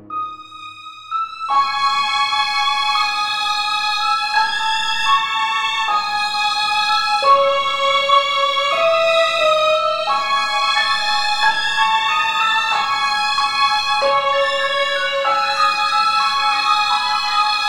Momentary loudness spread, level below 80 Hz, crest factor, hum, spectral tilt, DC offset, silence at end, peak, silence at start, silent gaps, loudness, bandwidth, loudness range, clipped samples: 4 LU; -60 dBFS; 16 dB; none; 0.5 dB/octave; under 0.1%; 0 s; -2 dBFS; 0 s; none; -16 LUFS; 17.5 kHz; 2 LU; under 0.1%